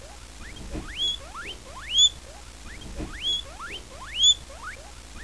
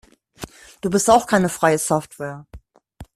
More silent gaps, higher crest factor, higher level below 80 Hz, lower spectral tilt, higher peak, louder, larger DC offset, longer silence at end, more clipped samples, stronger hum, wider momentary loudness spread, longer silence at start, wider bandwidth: neither; about the same, 20 dB vs 20 dB; first, -44 dBFS vs -50 dBFS; second, -0.5 dB/octave vs -4.5 dB/octave; second, -10 dBFS vs -2 dBFS; second, -22 LUFS vs -18 LUFS; first, 0.3% vs under 0.1%; about the same, 0 s vs 0.1 s; neither; neither; about the same, 24 LU vs 22 LU; second, 0 s vs 0.4 s; second, 11 kHz vs 15 kHz